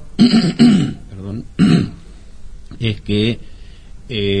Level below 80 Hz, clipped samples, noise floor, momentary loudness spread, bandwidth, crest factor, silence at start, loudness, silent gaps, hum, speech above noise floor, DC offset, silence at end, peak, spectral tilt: -36 dBFS; under 0.1%; -34 dBFS; 17 LU; 9.8 kHz; 16 dB; 0 s; -15 LUFS; none; none; 20 dB; under 0.1%; 0 s; 0 dBFS; -6.5 dB/octave